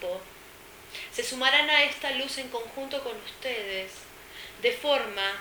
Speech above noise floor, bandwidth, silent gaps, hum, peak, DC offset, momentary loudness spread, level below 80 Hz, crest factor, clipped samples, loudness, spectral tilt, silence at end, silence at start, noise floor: 20 dB; over 20 kHz; none; none; -6 dBFS; under 0.1%; 23 LU; -62 dBFS; 24 dB; under 0.1%; -27 LUFS; -1 dB/octave; 0 s; 0 s; -49 dBFS